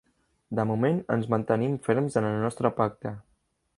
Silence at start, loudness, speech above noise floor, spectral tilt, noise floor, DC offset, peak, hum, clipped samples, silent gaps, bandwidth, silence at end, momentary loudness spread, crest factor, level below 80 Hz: 0.5 s; -27 LUFS; 45 dB; -8 dB/octave; -71 dBFS; under 0.1%; -6 dBFS; none; under 0.1%; none; 11.5 kHz; 0.55 s; 9 LU; 20 dB; -62 dBFS